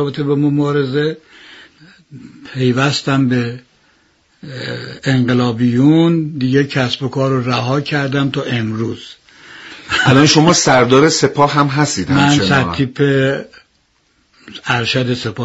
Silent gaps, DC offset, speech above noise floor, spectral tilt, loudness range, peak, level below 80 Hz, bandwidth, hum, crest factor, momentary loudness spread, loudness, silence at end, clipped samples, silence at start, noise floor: none; under 0.1%; 45 dB; -5 dB/octave; 7 LU; 0 dBFS; -48 dBFS; 8 kHz; none; 14 dB; 15 LU; -14 LUFS; 0 s; under 0.1%; 0 s; -59 dBFS